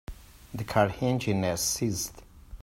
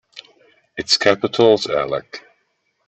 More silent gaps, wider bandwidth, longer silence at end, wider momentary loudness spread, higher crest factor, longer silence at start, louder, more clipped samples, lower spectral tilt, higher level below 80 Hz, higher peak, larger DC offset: neither; first, 16 kHz vs 8.4 kHz; second, 0.05 s vs 0.7 s; second, 13 LU vs 21 LU; about the same, 20 dB vs 18 dB; about the same, 0.1 s vs 0.15 s; second, -28 LUFS vs -17 LUFS; neither; about the same, -4.5 dB/octave vs -3.5 dB/octave; first, -50 dBFS vs -58 dBFS; second, -8 dBFS vs -2 dBFS; neither